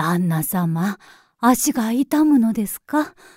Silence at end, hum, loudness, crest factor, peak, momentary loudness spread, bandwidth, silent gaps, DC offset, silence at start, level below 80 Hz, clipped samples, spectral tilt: 0.25 s; none; -19 LUFS; 16 dB; -4 dBFS; 8 LU; 16.5 kHz; none; under 0.1%; 0 s; -56 dBFS; under 0.1%; -5.5 dB/octave